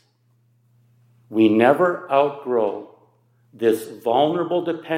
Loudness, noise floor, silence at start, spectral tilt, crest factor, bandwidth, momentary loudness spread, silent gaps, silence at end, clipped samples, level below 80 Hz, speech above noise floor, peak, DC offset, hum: -20 LUFS; -62 dBFS; 1.3 s; -6.5 dB/octave; 20 dB; 16 kHz; 9 LU; none; 0 s; under 0.1%; -76 dBFS; 43 dB; -2 dBFS; under 0.1%; none